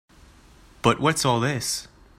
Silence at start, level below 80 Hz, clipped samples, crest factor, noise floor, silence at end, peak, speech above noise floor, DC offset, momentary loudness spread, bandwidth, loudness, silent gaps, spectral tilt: 0.85 s; -50 dBFS; under 0.1%; 22 dB; -51 dBFS; 0.35 s; -4 dBFS; 29 dB; under 0.1%; 7 LU; 16 kHz; -23 LUFS; none; -4 dB/octave